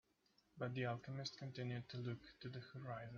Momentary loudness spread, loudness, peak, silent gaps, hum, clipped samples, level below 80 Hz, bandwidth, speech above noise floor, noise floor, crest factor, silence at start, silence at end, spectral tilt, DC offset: 8 LU; -49 LUFS; -30 dBFS; none; none; under 0.1%; -78 dBFS; 7 kHz; 31 dB; -79 dBFS; 20 dB; 0.55 s; 0 s; -5 dB/octave; under 0.1%